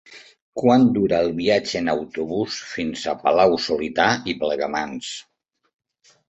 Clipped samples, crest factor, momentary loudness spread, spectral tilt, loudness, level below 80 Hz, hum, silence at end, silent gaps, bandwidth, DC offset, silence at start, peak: under 0.1%; 20 dB; 11 LU; -5 dB/octave; -21 LUFS; -54 dBFS; none; 1.1 s; 0.42-0.53 s; 8.2 kHz; under 0.1%; 0.1 s; -2 dBFS